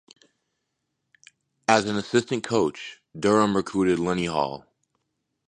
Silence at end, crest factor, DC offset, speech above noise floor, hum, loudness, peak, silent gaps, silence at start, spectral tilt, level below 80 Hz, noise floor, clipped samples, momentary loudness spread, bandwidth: 0.9 s; 24 dB; under 0.1%; 56 dB; none; -24 LUFS; -2 dBFS; none; 1.7 s; -5 dB/octave; -58 dBFS; -79 dBFS; under 0.1%; 10 LU; 11 kHz